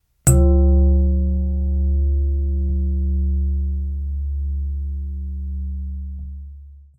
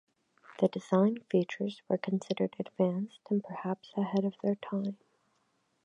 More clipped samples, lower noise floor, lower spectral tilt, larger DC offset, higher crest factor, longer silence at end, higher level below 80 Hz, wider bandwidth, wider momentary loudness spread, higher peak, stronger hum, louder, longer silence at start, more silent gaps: neither; second, -40 dBFS vs -75 dBFS; about the same, -7.5 dB/octave vs -8 dB/octave; neither; about the same, 18 dB vs 20 dB; second, 0.2 s vs 0.9 s; first, -20 dBFS vs -80 dBFS; first, 15 kHz vs 8.2 kHz; first, 15 LU vs 9 LU; first, -2 dBFS vs -14 dBFS; neither; first, -21 LUFS vs -33 LUFS; second, 0.25 s vs 0.5 s; neither